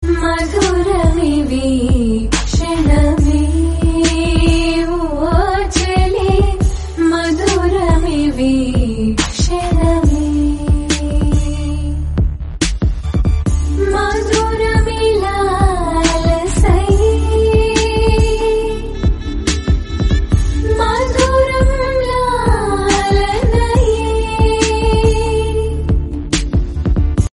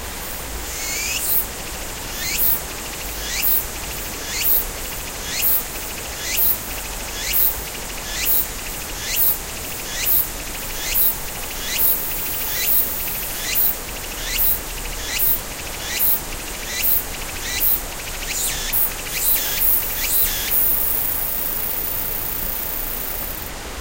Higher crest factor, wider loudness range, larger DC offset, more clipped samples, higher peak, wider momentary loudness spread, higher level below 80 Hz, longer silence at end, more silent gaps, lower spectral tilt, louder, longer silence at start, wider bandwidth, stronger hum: second, 14 dB vs 20 dB; about the same, 2 LU vs 3 LU; neither; neither; about the same, 0 dBFS vs -2 dBFS; second, 5 LU vs 11 LU; first, -18 dBFS vs -34 dBFS; about the same, 0.1 s vs 0 s; neither; first, -5.5 dB/octave vs -1 dB/octave; first, -15 LUFS vs -19 LUFS; about the same, 0 s vs 0 s; second, 11.5 kHz vs 16.5 kHz; neither